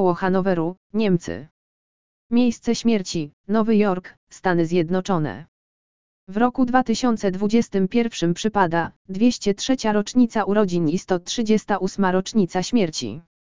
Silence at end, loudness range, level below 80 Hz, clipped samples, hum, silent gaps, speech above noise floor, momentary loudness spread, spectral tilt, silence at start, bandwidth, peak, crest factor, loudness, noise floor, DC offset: 0.25 s; 2 LU; -52 dBFS; under 0.1%; none; 0.77-0.90 s, 1.51-2.30 s, 3.33-3.44 s, 4.17-4.27 s, 5.48-6.27 s, 8.96-9.05 s; over 69 dB; 8 LU; -5.5 dB/octave; 0 s; 7.6 kHz; -2 dBFS; 20 dB; -21 LUFS; under -90 dBFS; 1%